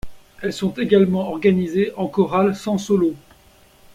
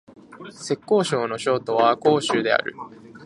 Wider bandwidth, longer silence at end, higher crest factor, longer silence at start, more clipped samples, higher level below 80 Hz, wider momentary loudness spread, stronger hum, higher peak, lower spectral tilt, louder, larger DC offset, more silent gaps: first, 14 kHz vs 11.5 kHz; first, 0.8 s vs 0 s; about the same, 18 dB vs 20 dB; second, 0.05 s vs 0.3 s; neither; first, -50 dBFS vs -68 dBFS; second, 8 LU vs 21 LU; neither; about the same, -2 dBFS vs -2 dBFS; first, -7 dB/octave vs -4.5 dB/octave; about the same, -20 LUFS vs -21 LUFS; neither; neither